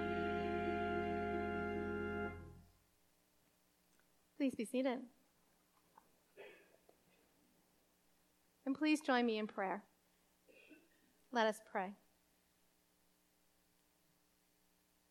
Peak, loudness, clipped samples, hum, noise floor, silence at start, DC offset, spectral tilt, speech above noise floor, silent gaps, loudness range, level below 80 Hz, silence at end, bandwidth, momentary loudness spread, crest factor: -22 dBFS; -41 LUFS; under 0.1%; none; -77 dBFS; 0 s; under 0.1%; -5.5 dB/octave; 38 dB; none; 6 LU; -68 dBFS; 3.15 s; 17 kHz; 18 LU; 22 dB